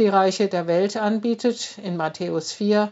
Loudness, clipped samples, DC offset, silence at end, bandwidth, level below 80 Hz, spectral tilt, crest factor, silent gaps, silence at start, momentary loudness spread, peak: -23 LUFS; under 0.1%; under 0.1%; 0 s; 8 kHz; -76 dBFS; -4.5 dB/octave; 16 dB; none; 0 s; 7 LU; -6 dBFS